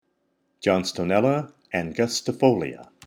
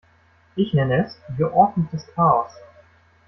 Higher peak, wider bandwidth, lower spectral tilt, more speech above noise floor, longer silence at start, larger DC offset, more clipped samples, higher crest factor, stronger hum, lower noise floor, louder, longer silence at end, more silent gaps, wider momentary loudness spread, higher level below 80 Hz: second, -6 dBFS vs -2 dBFS; first, 17 kHz vs 6 kHz; second, -5 dB/octave vs -9 dB/octave; first, 48 dB vs 37 dB; about the same, 0.6 s vs 0.55 s; neither; neither; about the same, 20 dB vs 20 dB; neither; first, -71 dBFS vs -57 dBFS; second, -24 LUFS vs -21 LUFS; second, 0.25 s vs 0.7 s; neither; second, 8 LU vs 11 LU; second, -60 dBFS vs -54 dBFS